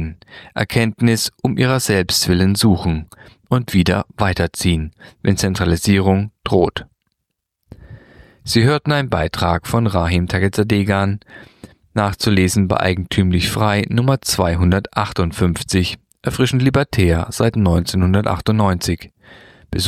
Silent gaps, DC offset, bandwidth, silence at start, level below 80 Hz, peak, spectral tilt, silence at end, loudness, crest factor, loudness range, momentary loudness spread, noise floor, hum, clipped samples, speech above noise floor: none; under 0.1%; 15.5 kHz; 0 s; -34 dBFS; -2 dBFS; -5.5 dB/octave; 0 s; -17 LUFS; 16 dB; 3 LU; 7 LU; -77 dBFS; none; under 0.1%; 60 dB